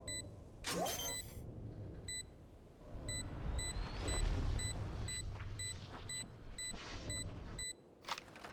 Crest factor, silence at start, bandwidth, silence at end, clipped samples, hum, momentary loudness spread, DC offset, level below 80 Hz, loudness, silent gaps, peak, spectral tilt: 18 dB; 0 s; over 20 kHz; 0 s; under 0.1%; none; 11 LU; under 0.1%; -48 dBFS; -44 LUFS; none; -26 dBFS; -3 dB/octave